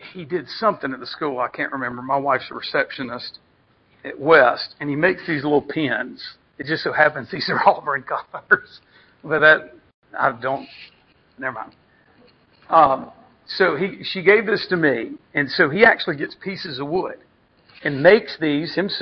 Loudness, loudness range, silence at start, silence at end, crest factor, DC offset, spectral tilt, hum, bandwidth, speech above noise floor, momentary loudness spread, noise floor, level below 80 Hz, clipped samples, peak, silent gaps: -20 LUFS; 5 LU; 0 s; 0 s; 20 dB; under 0.1%; -7 dB/octave; none; 6.2 kHz; 39 dB; 15 LU; -59 dBFS; -60 dBFS; under 0.1%; -2 dBFS; 9.94-10.02 s